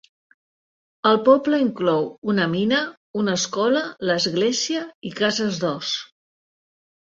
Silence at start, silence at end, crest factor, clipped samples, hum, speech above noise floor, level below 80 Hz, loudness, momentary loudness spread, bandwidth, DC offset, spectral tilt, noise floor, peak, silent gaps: 1.05 s; 1 s; 20 dB; under 0.1%; none; over 69 dB; -64 dBFS; -21 LUFS; 9 LU; 7.8 kHz; under 0.1%; -4 dB/octave; under -90 dBFS; -2 dBFS; 2.18-2.22 s, 2.97-3.14 s, 4.95-5.02 s